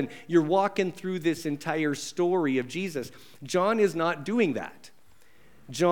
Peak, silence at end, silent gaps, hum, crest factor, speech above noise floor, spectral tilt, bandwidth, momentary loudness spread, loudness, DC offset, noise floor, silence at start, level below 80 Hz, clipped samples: -10 dBFS; 0 s; none; none; 18 dB; 34 dB; -5.5 dB/octave; 18 kHz; 12 LU; -27 LUFS; 0.3%; -61 dBFS; 0 s; -72 dBFS; under 0.1%